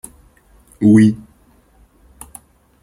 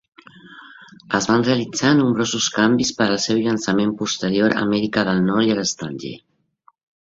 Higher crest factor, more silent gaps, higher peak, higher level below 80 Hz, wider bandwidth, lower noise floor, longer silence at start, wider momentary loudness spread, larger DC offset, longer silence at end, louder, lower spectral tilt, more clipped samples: about the same, 16 dB vs 18 dB; neither; about the same, -2 dBFS vs -2 dBFS; first, -50 dBFS vs -56 dBFS; first, 16 kHz vs 7.8 kHz; second, -52 dBFS vs -58 dBFS; first, 0.8 s vs 0.45 s; first, 27 LU vs 7 LU; neither; first, 1.65 s vs 0.85 s; first, -13 LUFS vs -19 LUFS; first, -7.5 dB/octave vs -4.5 dB/octave; neither